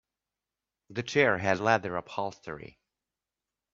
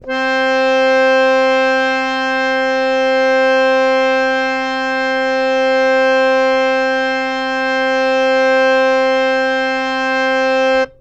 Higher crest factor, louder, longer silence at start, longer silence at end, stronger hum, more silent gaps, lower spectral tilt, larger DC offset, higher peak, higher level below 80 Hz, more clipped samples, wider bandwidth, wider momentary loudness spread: first, 24 dB vs 10 dB; second, -28 LUFS vs -14 LUFS; first, 0.9 s vs 0 s; first, 1.05 s vs 0.1 s; neither; neither; first, -5 dB/octave vs -2.5 dB/octave; neither; second, -8 dBFS vs -4 dBFS; second, -68 dBFS vs -50 dBFS; neither; about the same, 7.8 kHz vs 8.4 kHz; first, 17 LU vs 5 LU